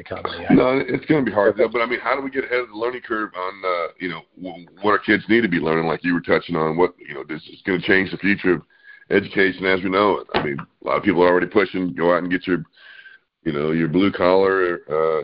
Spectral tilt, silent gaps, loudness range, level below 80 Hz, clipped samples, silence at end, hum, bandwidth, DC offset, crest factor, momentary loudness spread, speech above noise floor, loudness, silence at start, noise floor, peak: -4 dB/octave; none; 3 LU; -52 dBFS; under 0.1%; 0 s; none; 5.4 kHz; under 0.1%; 20 dB; 12 LU; 27 dB; -20 LUFS; 0 s; -47 dBFS; 0 dBFS